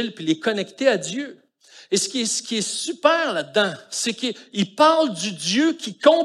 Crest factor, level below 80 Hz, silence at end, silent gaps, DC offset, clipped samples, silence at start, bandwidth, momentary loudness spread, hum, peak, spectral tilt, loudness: 20 dB; -80 dBFS; 0 s; none; under 0.1%; under 0.1%; 0 s; 13 kHz; 9 LU; none; -2 dBFS; -3 dB/octave; -21 LUFS